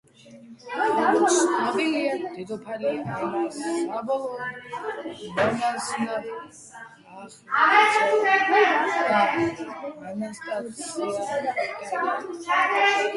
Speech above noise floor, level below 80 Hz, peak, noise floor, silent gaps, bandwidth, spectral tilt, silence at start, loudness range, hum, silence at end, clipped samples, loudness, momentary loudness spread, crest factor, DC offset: 23 dB; -68 dBFS; -4 dBFS; -47 dBFS; none; 11.5 kHz; -3 dB/octave; 0.25 s; 8 LU; none; 0 s; under 0.1%; -24 LUFS; 16 LU; 20 dB; under 0.1%